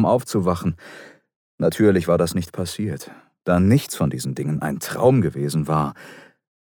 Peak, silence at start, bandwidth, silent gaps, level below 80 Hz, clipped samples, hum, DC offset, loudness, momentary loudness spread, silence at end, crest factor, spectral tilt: -4 dBFS; 0 s; over 20 kHz; 1.36-1.58 s; -50 dBFS; under 0.1%; none; under 0.1%; -21 LUFS; 13 LU; 0.4 s; 18 dB; -6.5 dB/octave